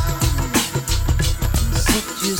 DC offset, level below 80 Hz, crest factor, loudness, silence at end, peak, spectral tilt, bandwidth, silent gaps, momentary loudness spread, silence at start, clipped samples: under 0.1%; -22 dBFS; 16 dB; -20 LUFS; 0 s; -4 dBFS; -4 dB/octave; 19.5 kHz; none; 3 LU; 0 s; under 0.1%